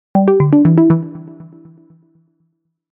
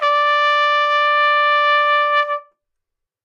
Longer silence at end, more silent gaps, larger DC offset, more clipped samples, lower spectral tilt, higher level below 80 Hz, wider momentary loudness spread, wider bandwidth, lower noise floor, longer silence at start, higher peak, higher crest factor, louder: first, 1.5 s vs 0.85 s; neither; neither; neither; first, -13.5 dB/octave vs 4.5 dB/octave; first, -52 dBFS vs -88 dBFS; first, 18 LU vs 4 LU; second, 3.3 kHz vs 7.4 kHz; second, -65 dBFS vs -79 dBFS; first, 0.15 s vs 0 s; first, 0 dBFS vs -6 dBFS; about the same, 14 dB vs 12 dB; first, -12 LUFS vs -15 LUFS